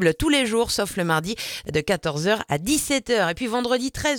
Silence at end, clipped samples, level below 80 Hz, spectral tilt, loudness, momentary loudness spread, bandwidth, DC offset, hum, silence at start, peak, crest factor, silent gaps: 0 s; under 0.1%; -44 dBFS; -3.5 dB/octave; -23 LUFS; 5 LU; 19 kHz; under 0.1%; none; 0 s; -6 dBFS; 18 dB; none